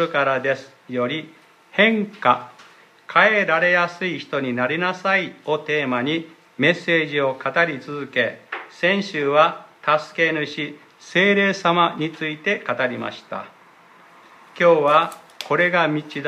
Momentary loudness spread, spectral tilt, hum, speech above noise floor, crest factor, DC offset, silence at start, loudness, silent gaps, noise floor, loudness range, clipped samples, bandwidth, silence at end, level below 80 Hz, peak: 12 LU; -5.5 dB/octave; none; 29 dB; 20 dB; under 0.1%; 0 s; -20 LUFS; none; -50 dBFS; 2 LU; under 0.1%; 12.5 kHz; 0 s; -74 dBFS; 0 dBFS